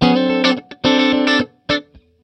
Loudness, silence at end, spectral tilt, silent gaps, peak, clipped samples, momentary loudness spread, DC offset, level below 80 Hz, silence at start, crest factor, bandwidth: -16 LUFS; 0.45 s; -5 dB/octave; none; 0 dBFS; under 0.1%; 7 LU; under 0.1%; -46 dBFS; 0 s; 16 dB; 9 kHz